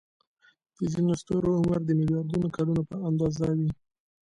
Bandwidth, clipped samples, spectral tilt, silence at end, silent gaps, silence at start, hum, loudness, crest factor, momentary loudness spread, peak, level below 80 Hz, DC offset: 10 kHz; under 0.1%; -8.5 dB/octave; 0.5 s; none; 0.8 s; none; -27 LUFS; 12 dB; 6 LU; -16 dBFS; -52 dBFS; under 0.1%